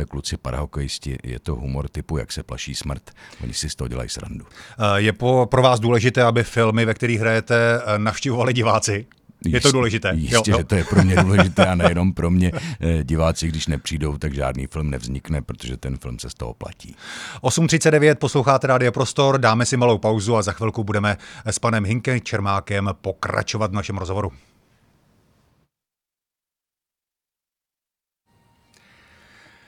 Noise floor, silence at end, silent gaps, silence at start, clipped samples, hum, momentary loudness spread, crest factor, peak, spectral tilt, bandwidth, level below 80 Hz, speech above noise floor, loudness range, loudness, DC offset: -89 dBFS; 5.3 s; none; 0 s; under 0.1%; none; 14 LU; 20 dB; 0 dBFS; -5 dB/octave; 14 kHz; -36 dBFS; 69 dB; 11 LU; -20 LUFS; under 0.1%